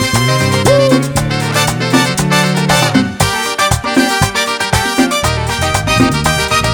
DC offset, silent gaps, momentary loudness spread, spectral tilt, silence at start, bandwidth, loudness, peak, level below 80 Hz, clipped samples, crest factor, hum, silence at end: under 0.1%; none; 4 LU; -4 dB/octave; 0 s; over 20 kHz; -12 LUFS; 0 dBFS; -30 dBFS; under 0.1%; 12 dB; none; 0 s